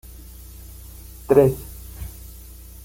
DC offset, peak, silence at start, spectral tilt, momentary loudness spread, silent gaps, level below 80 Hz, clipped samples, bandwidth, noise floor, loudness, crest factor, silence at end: under 0.1%; -2 dBFS; 1.3 s; -7.5 dB/octave; 25 LU; none; -40 dBFS; under 0.1%; 17 kHz; -41 dBFS; -19 LUFS; 22 dB; 0.75 s